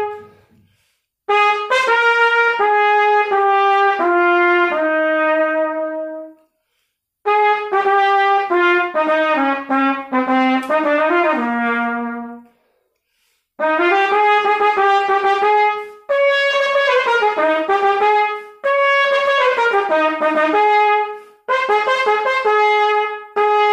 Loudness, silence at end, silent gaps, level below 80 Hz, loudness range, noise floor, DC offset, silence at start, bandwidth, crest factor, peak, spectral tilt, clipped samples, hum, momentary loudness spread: -15 LUFS; 0 s; none; -66 dBFS; 4 LU; -71 dBFS; under 0.1%; 0 s; 11 kHz; 14 dB; -2 dBFS; -3 dB/octave; under 0.1%; none; 8 LU